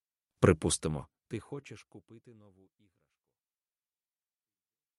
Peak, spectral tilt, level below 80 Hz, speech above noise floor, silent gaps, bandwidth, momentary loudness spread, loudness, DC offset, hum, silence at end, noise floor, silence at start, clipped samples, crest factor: -8 dBFS; -5 dB/octave; -56 dBFS; over 57 dB; none; 11.5 kHz; 21 LU; -31 LUFS; under 0.1%; none; 2.8 s; under -90 dBFS; 0.4 s; under 0.1%; 28 dB